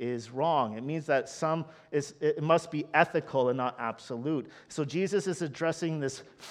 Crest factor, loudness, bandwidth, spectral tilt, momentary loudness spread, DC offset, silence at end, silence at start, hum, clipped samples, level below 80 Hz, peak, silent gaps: 24 dB; -30 LUFS; 12.5 kHz; -5.5 dB/octave; 9 LU; under 0.1%; 0 s; 0 s; none; under 0.1%; -76 dBFS; -6 dBFS; none